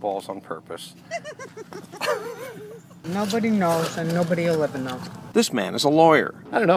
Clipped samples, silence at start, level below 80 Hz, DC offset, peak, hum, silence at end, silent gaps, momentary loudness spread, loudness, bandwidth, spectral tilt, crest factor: under 0.1%; 0 s; -66 dBFS; under 0.1%; -4 dBFS; none; 0 s; none; 20 LU; -23 LUFS; 16 kHz; -5 dB/octave; 20 dB